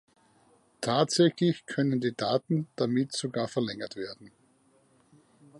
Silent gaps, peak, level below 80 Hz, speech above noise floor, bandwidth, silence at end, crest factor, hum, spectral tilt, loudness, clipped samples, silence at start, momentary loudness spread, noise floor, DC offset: none; -10 dBFS; -72 dBFS; 37 dB; 11.5 kHz; 1.3 s; 20 dB; none; -5.5 dB/octave; -29 LUFS; under 0.1%; 0.8 s; 13 LU; -65 dBFS; under 0.1%